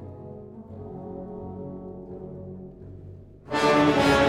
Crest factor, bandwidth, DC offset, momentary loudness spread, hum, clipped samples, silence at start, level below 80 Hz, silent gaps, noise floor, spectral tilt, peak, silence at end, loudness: 20 dB; 15 kHz; under 0.1%; 24 LU; none; under 0.1%; 0 s; -48 dBFS; none; -44 dBFS; -5.5 dB/octave; -8 dBFS; 0 s; -25 LUFS